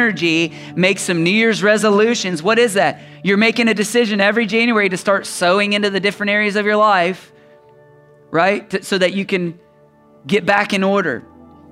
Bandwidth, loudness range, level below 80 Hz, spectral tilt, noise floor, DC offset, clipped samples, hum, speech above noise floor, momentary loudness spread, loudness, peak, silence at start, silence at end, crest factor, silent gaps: 15.5 kHz; 4 LU; -64 dBFS; -4.5 dB/octave; -49 dBFS; under 0.1%; under 0.1%; none; 34 dB; 7 LU; -16 LUFS; 0 dBFS; 0 s; 0.5 s; 16 dB; none